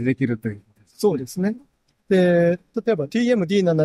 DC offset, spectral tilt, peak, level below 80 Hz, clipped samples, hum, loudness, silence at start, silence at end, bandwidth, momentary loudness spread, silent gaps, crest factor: under 0.1%; -7 dB/octave; -8 dBFS; -62 dBFS; under 0.1%; none; -21 LUFS; 0 s; 0 s; 14.5 kHz; 11 LU; none; 12 dB